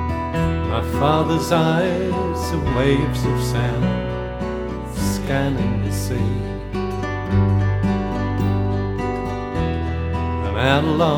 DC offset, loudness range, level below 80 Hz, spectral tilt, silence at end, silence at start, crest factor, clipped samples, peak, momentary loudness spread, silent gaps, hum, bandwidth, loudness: under 0.1%; 3 LU; -30 dBFS; -6.5 dB/octave; 0 s; 0 s; 20 dB; under 0.1%; 0 dBFS; 8 LU; none; none; 17 kHz; -21 LUFS